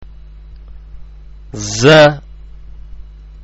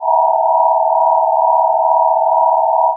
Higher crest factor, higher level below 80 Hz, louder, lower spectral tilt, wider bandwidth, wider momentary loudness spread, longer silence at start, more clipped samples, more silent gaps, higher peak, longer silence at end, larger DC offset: about the same, 16 dB vs 12 dB; first, -34 dBFS vs under -90 dBFS; first, -10 LUFS vs -13 LUFS; first, -4.5 dB/octave vs 5 dB/octave; first, 8.2 kHz vs 1.1 kHz; first, 23 LU vs 0 LU; about the same, 0 s vs 0 s; neither; neither; about the same, 0 dBFS vs 0 dBFS; first, 0.4 s vs 0 s; neither